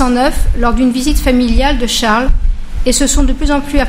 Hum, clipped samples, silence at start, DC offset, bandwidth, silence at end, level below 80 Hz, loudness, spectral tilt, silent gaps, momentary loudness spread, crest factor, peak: none; 0.3%; 0 s; under 0.1%; 16.5 kHz; 0 s; -14 dBFS; -13 LUFS; -4 dB/octave; none; 5 LU; 10 dB; 0 dBFS